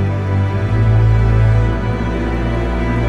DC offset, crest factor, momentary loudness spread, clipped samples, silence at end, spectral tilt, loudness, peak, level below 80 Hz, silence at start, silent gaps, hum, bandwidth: under 0.1%; 12 dB; 6 LU; under 0.1%; 0 s; -8.5 dB/octave; -16 LUFS; -2 dBFS; -20 dBFS; 0 s; none; none; 6.2 kHz